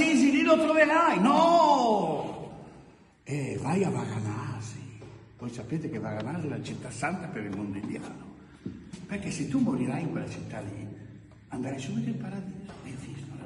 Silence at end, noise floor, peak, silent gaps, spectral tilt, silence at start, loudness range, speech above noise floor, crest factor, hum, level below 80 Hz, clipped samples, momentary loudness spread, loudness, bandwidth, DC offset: 0 s; -54 dBFS; -8 dBFS; none; -6 dB/octave; 0 s; 11 LU; 26 dB; 20 dB; none; -60 dBFS; under 0.1%; 22 LU; -28 LUFS; 11.5 kHz; under 0.1%